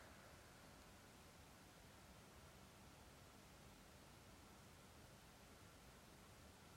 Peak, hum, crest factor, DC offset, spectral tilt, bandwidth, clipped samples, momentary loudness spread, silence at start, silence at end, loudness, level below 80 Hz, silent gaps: -50 dBFS; none; 14 dB; under 0.1%; -3.5 dB/octave; 16 kHz; under 0.1%; 1 LU; 0 s; 0 s; -64 LUFS; -74 dBFS; none